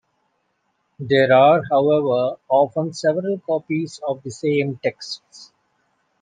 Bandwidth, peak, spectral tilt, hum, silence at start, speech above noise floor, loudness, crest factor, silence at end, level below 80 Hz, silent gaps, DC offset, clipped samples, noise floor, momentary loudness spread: 9.4 kHz; -4 dBFS; -6 dB/octave; none; 1 s; 51 dB; -19 LUFS; 18 dB; 0.75 s; -68 dBFS; none; under 0.1%; under 0.1%; -70 dBFS; 14 LU